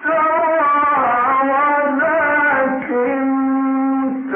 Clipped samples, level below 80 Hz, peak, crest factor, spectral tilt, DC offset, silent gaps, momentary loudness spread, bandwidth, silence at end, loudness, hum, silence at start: under 0.1%; -58 dBFS; -6 dBFS; 10 dB; -9.5 dB/octave; under 0.1%; none; 4 LU; 3.5 kHz; 0 s; -16 LUFS; none; 0 s